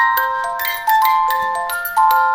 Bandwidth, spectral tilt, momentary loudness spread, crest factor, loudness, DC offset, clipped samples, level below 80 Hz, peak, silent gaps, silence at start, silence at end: 17 kHz; 0.5 dB/octave; 6 LU; 14 dB; -16 LUFS; under 0.1%; under 0.1%; -54 dBFS; -2 dBFS; none; 0 s; 0 s